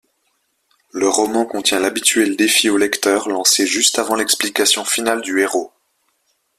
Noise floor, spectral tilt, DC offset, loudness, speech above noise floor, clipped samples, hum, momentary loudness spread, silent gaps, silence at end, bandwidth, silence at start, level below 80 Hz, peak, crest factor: -66 dBFS; -1 dB/octave; under 0.1%; -15 LUFS; 50 dB; under 0.1%; none; 5 LU; none; 0.9 s; 16 kHz; 0.95 s; -60 dBFS; 0 dBFS; 18 dB